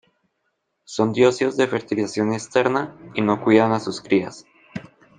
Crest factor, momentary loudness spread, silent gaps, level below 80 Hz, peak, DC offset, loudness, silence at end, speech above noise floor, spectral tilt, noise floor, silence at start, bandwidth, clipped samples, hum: 20 dB; 18 LU; none; -62 dBFS; -2 dBFS; under 0.1%; -21 LUFS; 0.35 s; 53 dB; -5.5 dB/octave; -74 dBFS; 0.9 s; 9.6 kHz; under 0.1%; none